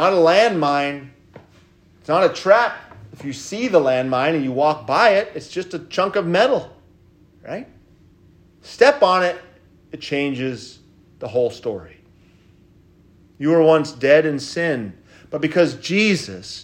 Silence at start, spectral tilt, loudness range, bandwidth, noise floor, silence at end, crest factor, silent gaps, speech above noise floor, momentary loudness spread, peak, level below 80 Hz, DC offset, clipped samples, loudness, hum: 0 s; -5 dB/octave; 7 LU; 10 kHz; -52 dBFS; 0 s; 20 dB; none; 34 dB; 19 LU; 0 dBFS; -60 dBFS; under 0.1%; under 0.1%; -18 LUFS; none